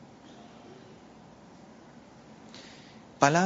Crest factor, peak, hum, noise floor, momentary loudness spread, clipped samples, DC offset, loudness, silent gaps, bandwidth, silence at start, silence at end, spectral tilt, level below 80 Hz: 30 dB; -4 dBFS; none; -52 dBFS; 15 LU; under 0.1%; under 0.1%; -25 LUFS; none; 7.6 kHz; 2.6 s; 0 s; -4.5 dB/octave; -70 dBFS